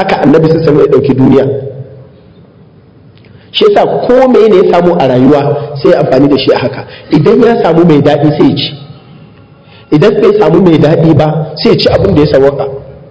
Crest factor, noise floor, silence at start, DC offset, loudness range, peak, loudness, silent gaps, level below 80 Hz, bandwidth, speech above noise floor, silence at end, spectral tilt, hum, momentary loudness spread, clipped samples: 8 dB; -38 dBFS; 0 s; under 0.1%; 4 LU; 0 dBFS; -7 LUFS; none; -34 dBFS; 8 kHz; 32 dB; 0.15 s; -8 dB/octave; none; 9 LU; 7%